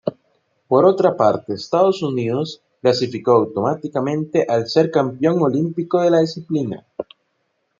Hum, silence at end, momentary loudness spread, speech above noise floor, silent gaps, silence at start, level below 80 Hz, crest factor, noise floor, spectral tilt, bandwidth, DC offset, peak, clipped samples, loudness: none; 0.8 s; 10 LU; 52 dB; none; 0.05 s; -66 dBFS; 16 dB; -69 dBFS; -7 dB/octave; 7.6 kHz; under 0.1%; -2 dBFS; under 0.1%; -18 LUFS